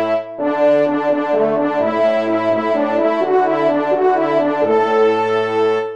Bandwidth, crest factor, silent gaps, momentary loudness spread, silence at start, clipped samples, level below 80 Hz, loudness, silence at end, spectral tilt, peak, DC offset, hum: 8.4 kHz; 12 dB; none; 3 LU; 0 s; under 0.1%; -68 dBFS; -16 LUFS; 0 s; -6.5 dB/octave; -4 dBFS; 0.3%; none